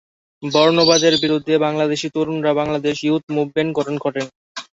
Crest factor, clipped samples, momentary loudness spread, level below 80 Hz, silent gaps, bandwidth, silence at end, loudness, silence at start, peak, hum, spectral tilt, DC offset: 18 dB; under 0.1%; 11 LU; -56 dBFS; 3.23-3.27 s, 4.35-4.55 s; 8 kHz; 0.15 s; -18 LUFS; 0.4 s; 0 dBFS; none; -4 dB/octave; under 0.1%